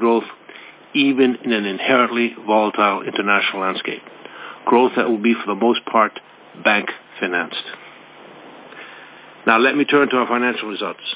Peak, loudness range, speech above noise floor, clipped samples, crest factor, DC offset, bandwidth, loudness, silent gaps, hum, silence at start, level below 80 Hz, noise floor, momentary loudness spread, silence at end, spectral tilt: 0 dBFS; 4 LU; 24 dB; under 0.1%; 18 dB; under 0.1%; 4 kHz; -18 LUFS; none; none; 0 s; -72 dBFS; -42 dBFS; 22 LU; 0 s; -8.5 dB/octave